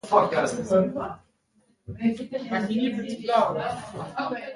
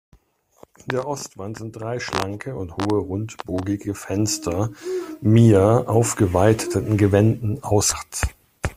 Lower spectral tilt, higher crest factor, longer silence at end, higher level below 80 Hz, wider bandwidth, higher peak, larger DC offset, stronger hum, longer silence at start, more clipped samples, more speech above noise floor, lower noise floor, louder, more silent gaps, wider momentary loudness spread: about the same, -6 dB/octave vs -5.5 dB/octave; about the same, 20 dB vs 18 dB; about the same, 0 s vs 0.05 s; second, -58 dBFS vs -42 dBFS; second, 11.5 kHz vs 15.5 kHz; second, -6 dBFS vs -2 dBFS; neither; neither; second, 0.05 s vs 0.85 s; neither; first, 41 dB vs 37 dB; first, -66 dBFS vs -57 dBFS; second, -26 LUFS vs -21 LUFS; neither; about the same, 12 LU vs 13 LU